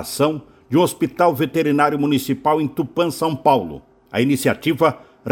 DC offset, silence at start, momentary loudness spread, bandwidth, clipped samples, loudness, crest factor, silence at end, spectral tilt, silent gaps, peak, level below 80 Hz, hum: under 0.1%; 0 s; 6 LU; 17 kHz; under 0.1%; -19 LUFS; 18 dB; 0 s; -5.5 dB/octave; none; 0 dBFS; -56 dBFS; none